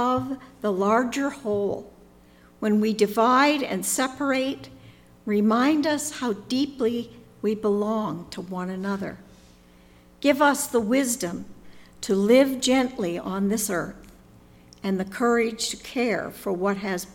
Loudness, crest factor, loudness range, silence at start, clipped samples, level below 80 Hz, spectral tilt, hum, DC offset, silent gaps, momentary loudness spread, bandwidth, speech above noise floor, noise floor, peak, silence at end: -24 LUFS; 18 dB; 5 LU; 0 s; under 0.1%; -58 dBFS; -4 dB/octave; none; under 0.1%; none; 13 LU; 18.5 kHz; 29 dB; -53 dBFS; -6 dBFS; 0.05 s